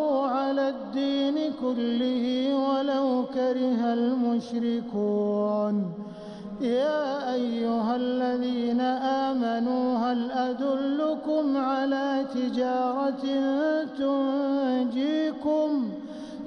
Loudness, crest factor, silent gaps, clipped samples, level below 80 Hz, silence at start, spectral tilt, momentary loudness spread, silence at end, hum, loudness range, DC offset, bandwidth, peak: -26 LUFS; 10 dB; none; under 0.1%; -66 dBFS; 0 s; -6.5 dB/octave; 3 LU; 0 s; none; 2 LU; under 0.1%; 6.6 kHz; -16 dBFS